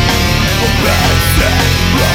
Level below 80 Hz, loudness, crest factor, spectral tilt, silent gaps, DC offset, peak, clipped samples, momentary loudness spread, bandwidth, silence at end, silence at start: -18 dBFS; -11 LUFS; 10 dB; -4 dB/octave; none; under 0.1%; 0 dBFS; under 0.1%; 1 LU; 17 kHz; 0 s; 0 s